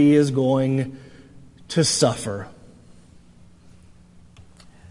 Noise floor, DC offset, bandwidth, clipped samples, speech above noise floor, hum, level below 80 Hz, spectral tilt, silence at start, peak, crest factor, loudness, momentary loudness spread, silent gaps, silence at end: -49 dBFS; under 0.1%; 11.5 kHz; under 0.1%; 30 dB; none; -56 dBFS; -5 dB/octave; 0 s; -4 dBFS; 20 dB; -21 LUFS; 16 LU; none; 2.4 s